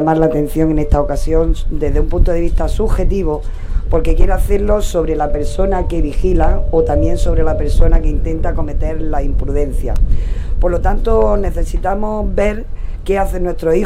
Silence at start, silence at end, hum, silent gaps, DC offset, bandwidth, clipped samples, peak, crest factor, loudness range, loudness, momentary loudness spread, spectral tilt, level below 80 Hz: 0 s; 0 s; none; none; under 0.1%; 11.5 kHz; under 0.1%; 0 dBFS; 12 dB; 2 LU; -17 LUFS; 6 LU; -7.5 dB/octave; -14 dBFS